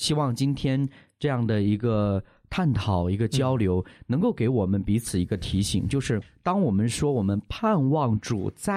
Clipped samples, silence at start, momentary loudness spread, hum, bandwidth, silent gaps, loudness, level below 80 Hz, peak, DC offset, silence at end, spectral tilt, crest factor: under 0.1%; 0 s; 5 LU; none; 14.5 kHz; none; -25 LUFS; -46 dBFS; -10 dBFS; under 0.1%; 0 s; -6.5 dB/octave; 14 dB